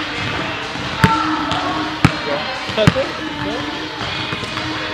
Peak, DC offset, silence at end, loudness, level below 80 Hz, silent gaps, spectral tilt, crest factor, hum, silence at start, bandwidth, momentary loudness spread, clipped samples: 0 dBFS; under 0.1%; 0 s; -19 LUFS; -38 dBFS; none; -5 dB/octave; 20 dB; none; 0 s; 14 kHz; 8 LU; under 0.1%